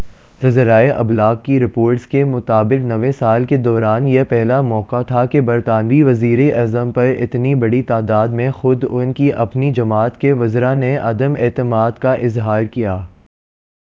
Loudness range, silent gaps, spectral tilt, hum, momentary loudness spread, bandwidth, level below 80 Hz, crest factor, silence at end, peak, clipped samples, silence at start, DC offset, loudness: 2 LU; none; -10 dB/octave; none; 5 LU; 7 kHz; -44 dBFS; 14 dB; 0.8 s; 0 dBFS; under 0.1%; 0 s; under 0.1%; -15 LUFS